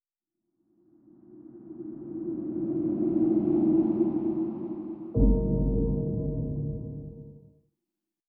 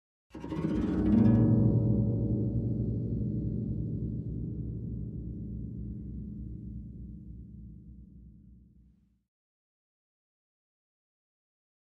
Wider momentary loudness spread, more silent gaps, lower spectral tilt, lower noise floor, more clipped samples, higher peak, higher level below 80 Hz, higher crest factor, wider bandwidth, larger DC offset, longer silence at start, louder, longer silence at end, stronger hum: second, 18 LU vs 23 LU; neither; first, -14 dB/octave vs -11.5 dB/octave; first, -87 dBFS vs -63 dBFS; neither; first, -10 dBFS vs -14 dBFS; first, -36 dBFS vs -44 dBFS; about the same, 18 dB vs 20 dB; second, 2.2 kHz vs 3.7 kHz; neither; first, 1.3 s vs 0.35 s; first, -28 LUFS vs -31 LUFS; second, 0.9 s vs 3.4 s; neither